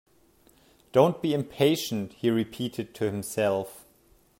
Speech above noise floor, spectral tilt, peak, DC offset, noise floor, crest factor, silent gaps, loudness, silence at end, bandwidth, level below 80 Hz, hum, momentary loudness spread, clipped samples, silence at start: 35 dB; -5.5 dB/octave; -6 dBFS; under 0.1%; -61 dBFS; 22 dB; none; -27 LUFS; 0.6 s; 16.5 kHz; -66 dBFS; none; 9 LU; under 0.1%; 0.95 s